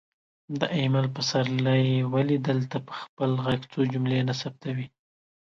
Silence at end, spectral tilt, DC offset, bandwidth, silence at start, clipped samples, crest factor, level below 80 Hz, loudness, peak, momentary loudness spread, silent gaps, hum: 0.55 s; -6.5 dB/octave; under 0.1%; 7.4 kHz; 0.5 s; under 0.1%; 18 dB; -62 dBFS; -26 LUFS; -8 dBFS; 10 LU; 3.09-3.17 s; none